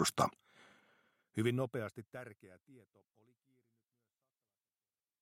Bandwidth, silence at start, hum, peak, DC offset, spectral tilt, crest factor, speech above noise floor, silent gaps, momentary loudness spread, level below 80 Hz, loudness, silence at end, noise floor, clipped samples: 16 kHz; 0 s; none; -18 dBFS; under 0.1%; -4.5 dB/octave; 26 dB; over 50 dB; none; 17 LU; -76 dBFS; -38 LUFS; 2.45 s; under -90 dBFS; under 0.1%